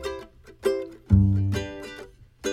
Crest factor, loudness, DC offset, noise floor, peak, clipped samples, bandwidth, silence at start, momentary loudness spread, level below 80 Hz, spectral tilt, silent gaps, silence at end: 18 dB; -25 LUFS; under 0.1%; -45 dBFS; -6 dBFS; under 0.1%; 13 kHz; 0 s; 20 LU; -38 dBFS; -7 dB/octave; none; 0 s